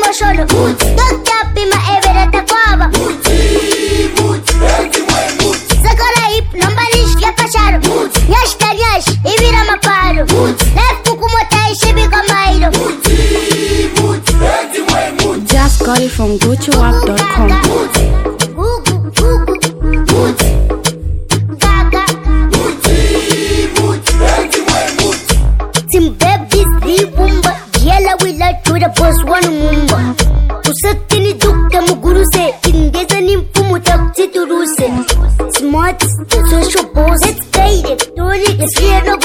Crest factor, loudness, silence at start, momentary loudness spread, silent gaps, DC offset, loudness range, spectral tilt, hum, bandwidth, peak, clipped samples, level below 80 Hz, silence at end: 10 dB; -11 LUFS; 0 s; 4 LU; none; under 0.1%; 2 LU; -4 dB/octave; none; 17.5 kHz; 0 dBFS; under 0.1%; -14 dBFS; 0 s